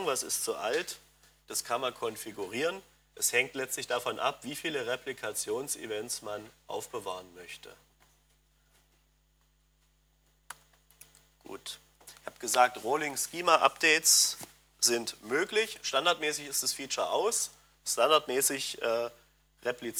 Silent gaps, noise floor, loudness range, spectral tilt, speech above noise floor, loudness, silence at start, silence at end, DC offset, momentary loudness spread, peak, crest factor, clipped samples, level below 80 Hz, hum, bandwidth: none; -69 dBFS; 18 LU; -0.5 dB/octave; 38 dB; -30 LUFS; 0 s; 0 s; under 0.1%; 19 LU; -6 dBFS; 26 dB; under 0.1%; -70 dBFS; none; 20 kHz